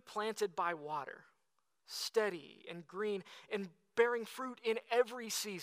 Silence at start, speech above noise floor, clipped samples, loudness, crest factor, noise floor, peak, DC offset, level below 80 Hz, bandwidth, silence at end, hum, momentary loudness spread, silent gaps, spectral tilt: 0.05 s; 46 dB; under 0.1%; -38 LUFS; 22 dB; -84 dBFS; -18 dBFS; under 0.1%; under -90 dBFS; 15.5 kHz; 0 s; none; 14 LU; none; -2.5 dB/octave